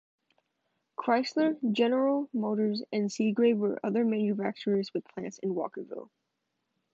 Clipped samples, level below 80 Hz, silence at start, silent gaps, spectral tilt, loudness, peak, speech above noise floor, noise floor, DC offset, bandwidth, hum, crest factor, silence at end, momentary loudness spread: under 0.1%; -84 dBFS; 1 s; none; -6 dB/octave; -29 LUFS; -14 dBFS; 53 dB; -82 dBFS; under 0.1%; 7.8 kHz; none; 16 dB; 0.9 s; 11 LU